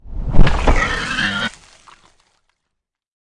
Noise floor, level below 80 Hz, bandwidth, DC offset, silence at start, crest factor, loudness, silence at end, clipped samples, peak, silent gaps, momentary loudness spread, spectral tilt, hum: -78 dBFS; -20 dBFS; 10 kHz; under 0.1%; 0.05 s; 16 dB; -19 LUFS; 1.4 s; under 0.1%; 0 dBFS; none; 6 LU; -5 dB/octave; none